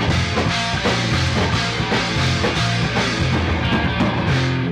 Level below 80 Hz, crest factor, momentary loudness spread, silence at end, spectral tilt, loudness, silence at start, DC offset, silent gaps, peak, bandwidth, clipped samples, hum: -32 dBFS; 8 dB; 1 LU; 0 s; -5 dB/octave; -19 LUFS; 0 s; under 0.1%; none; -10 dBFS; 11.5 kHz; under 0.1%; none